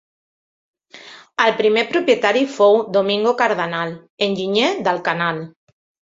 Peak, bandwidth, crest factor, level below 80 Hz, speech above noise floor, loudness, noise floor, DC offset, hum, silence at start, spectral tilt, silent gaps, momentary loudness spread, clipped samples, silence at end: -2 dBFS; 7.8 kHz; 18 dB; -66 dBFS; 24 dB; -18 LUFS; -42 dBFS; under 0.1%; none; 0.95 s; -4.5 dB/octave; 4.10-4.18 s; 9 LU; under 0.1%; 0.65 s